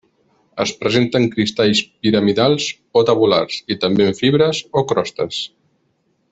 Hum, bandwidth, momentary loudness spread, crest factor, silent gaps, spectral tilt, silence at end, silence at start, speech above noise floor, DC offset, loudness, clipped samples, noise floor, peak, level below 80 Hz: none; 8.2 kHz; 8 LU; 16 dB; none; -5 dB/octave; 0.85 s; 0.55 s; 48 dB; under 0.1%; -17 LUFS; under 0.1%; -64 dBFS; -2 dBFS; -54 dBFS